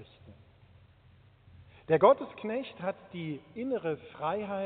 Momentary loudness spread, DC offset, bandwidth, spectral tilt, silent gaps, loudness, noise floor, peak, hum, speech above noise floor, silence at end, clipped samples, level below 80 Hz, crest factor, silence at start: 16 LU; under 0.1%; 4.5 kHz; -5 dB/octave; none; -31 LUFS; -60 dBFS; -10 dBFS; none; 30 dB; 0 s; under 0.1%; -68 dBFS; 24 dB; 0 s